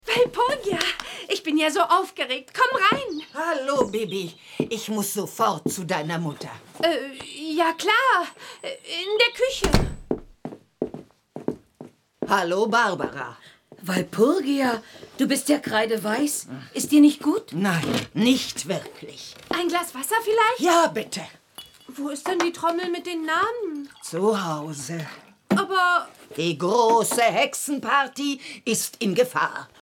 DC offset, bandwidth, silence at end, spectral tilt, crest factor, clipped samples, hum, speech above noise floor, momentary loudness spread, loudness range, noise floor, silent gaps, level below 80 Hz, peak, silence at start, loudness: under 0.1%; 18.5 kHz; 0.15 s; -4 dB/octave; 22 dB; under 0.1%; none; 24 dB; 16 LU; 5 LU; -47 dBFS; none; -44 dBFS; -2 dBFS; 0.05 s; -23 LUFS